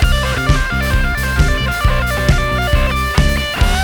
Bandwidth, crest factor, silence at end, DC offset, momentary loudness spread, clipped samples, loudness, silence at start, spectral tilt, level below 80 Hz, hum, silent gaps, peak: over 20 kHz; 14 dB; 0 s; under 0.1%; 1 LU; under 0.1%; -15 LUFS; 0 s; -5 dB/octave; -16 dBFS; none; none; 0 dBFS